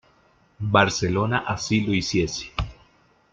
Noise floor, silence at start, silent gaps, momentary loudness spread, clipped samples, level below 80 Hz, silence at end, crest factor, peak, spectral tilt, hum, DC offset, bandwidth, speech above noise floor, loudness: -60 dBFS; 0.6 s; none; 12 LU; under 0.1%; -42 dBFS; 0.6 s; 22 dB; -2 dBFS; -5 dB/octave; none; under 0.1%; 8.8 kHz; 37 dB; -23 LUFS